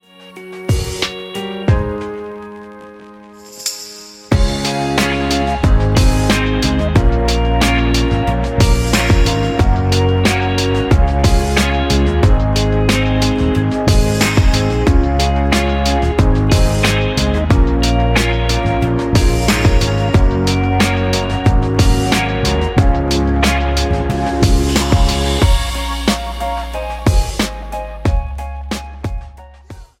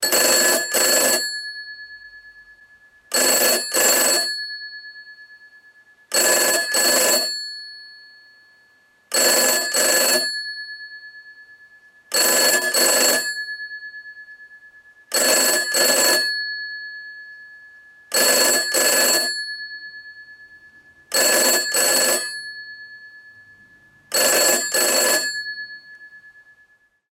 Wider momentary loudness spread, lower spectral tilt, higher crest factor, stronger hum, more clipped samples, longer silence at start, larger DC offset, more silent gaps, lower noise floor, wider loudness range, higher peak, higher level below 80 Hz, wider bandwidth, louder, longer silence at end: second, 10 LU vs 21 LU; first, -5.5 dB/octave vs 1 dB/octave; second, 12 dB vs 18 dB; neither; neither; first, 0.2 s vs 0 s; neither; neither; second, -37 dBFS vs -58 dBFS; first, 7 LU vs 1 LU; first, 0 dBFS vs -4 dBFS; first, -18 dBFS vs -72 dBFS; about the same, 16 kHz vs 16.5 kHz; about the same, -15 LUFS vs -17 LUFS; second, 0.15 s vs 0.85 s